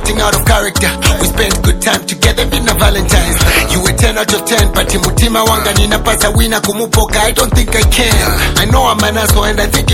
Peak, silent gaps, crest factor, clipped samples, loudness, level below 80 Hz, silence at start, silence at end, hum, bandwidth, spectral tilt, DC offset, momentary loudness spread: 0 dBFS; none; 10 dB; under 0.1%; -10 LUFS; -16 dBFS; 0 s; 0 s; none; 17.5 kHz; -3.5 dB/octave; under 0.1%; 2 LU